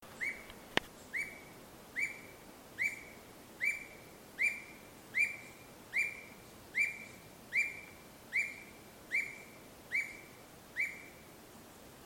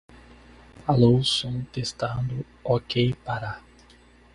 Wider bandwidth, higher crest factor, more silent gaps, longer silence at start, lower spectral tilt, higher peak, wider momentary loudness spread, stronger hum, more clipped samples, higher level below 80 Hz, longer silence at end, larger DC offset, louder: first, 16.5 kHz vs 11 kHz; first, 30 dB vs 20 dB; neither; second, 0 s vs 0.8 s; second, -2 dB/octave vs -6 dB/octave; second, -10 dBFS vs -6 dBFS; first, 20 LU vs 14 LU; second, none vs 60 Hz at -40 dBFS; neither; second, -70 dBFS vs -50 dBFS; second, 0 s vs 0.75 s; neither; second, -37 LUFS vs -25 LUFS